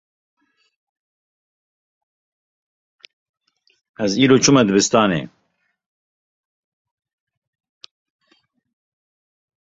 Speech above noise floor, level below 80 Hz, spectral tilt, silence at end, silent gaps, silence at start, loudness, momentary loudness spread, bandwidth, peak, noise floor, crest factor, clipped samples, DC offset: 48 dB; -60 dBFS; -4 dB/octave; 4.45 s; none; 4 s; -15 LUFS; 13 LU; 8 kHz; -2 dBFS; -63 dBFS; 22 dB; under 0.1%; under 0.1%